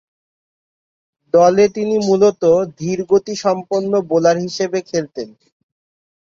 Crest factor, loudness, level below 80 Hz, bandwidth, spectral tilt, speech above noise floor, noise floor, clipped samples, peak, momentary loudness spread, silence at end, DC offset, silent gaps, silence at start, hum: 16 dB; -16 LUFS; -58 dBFS; 7.6 kHz; -5.5 dB/octave; over 75 dB; under -90 dBFS; under 0.1%; -2 dBFS; 10 LU; 1.05 s; under 0.1%; none; 1.35 s; none